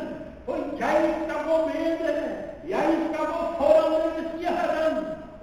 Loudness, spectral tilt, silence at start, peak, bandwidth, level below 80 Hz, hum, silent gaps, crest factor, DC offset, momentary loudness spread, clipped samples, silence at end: -25 LUFS; -5.5 dB/octave; 0 s; -6 dBFS; 13 kHz; -52 dBFS; none; none; 18 dB; under 0.1%; 12 LU; under 0.1%; 0 s